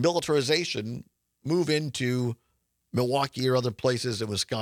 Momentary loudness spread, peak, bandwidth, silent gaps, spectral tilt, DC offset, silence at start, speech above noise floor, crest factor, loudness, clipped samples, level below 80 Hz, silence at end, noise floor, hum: 9 LU; -10 dBFS; 17 kHz; none; -5 dB/octave; under 0.1%; 0 s; 32 dB; 18 dB; -27 LUFS; under 0.1%; -66 dBFS; 0 s; -58 dBFS; none